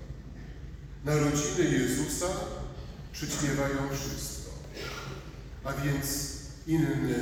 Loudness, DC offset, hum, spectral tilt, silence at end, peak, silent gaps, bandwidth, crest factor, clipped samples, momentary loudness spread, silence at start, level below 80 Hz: -31 LUFS; under 0.1%; none; -4.5 dB/octave; 0 s; -16 dBFS; none; 19.5 kHz; 16 dB; under 0.1%; 17 LU; 0 s; -44 dBFS